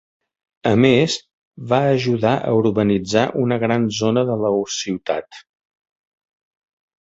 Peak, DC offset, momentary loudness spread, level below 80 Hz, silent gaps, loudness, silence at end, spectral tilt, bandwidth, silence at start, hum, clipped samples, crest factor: 0 dBFS; under 0.1%; 9 LU; -54 dBFS; 1.33-1.51 s; -19 LUFS; 1.6 s; -5.5 dB/octave; 8 kHz; 0.65 s; none; under 0.1%; 18 dB